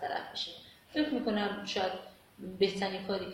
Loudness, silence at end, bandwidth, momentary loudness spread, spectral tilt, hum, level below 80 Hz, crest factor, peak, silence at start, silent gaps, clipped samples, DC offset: -34 LUFS; 0 s; 16.5 kHz; 15 LU; -5 dB/octave; none; -68 dBFS; 20 dB; -16 dBFS; 0 s; none; under 0.1%; under 0.1%